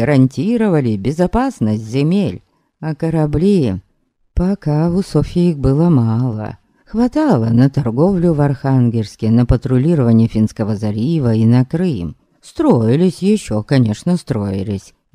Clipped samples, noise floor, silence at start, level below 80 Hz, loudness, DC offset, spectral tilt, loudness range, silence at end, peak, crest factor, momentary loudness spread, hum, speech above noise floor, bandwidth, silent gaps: under 0.1%; -61 dBFS; 0 s; -34 dBFS; -15 LUFS; under 0.1%; -8.5 dB/octave; 3 LU; 0.35 s; 0 dBFS; 14 dB; 9 LU; none; 47 dB; 11.5 kHz; none